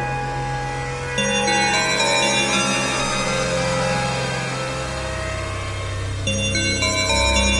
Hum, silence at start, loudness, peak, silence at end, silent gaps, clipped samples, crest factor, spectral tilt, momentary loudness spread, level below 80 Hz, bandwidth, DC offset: none; 0 s; -20 LUFS; -6 dBFS; 0 s; none; under 0.1%; 16 dB; -3 dB/octave; 9 LU; -34 dBFS; 11.5 kHz; under 0.1%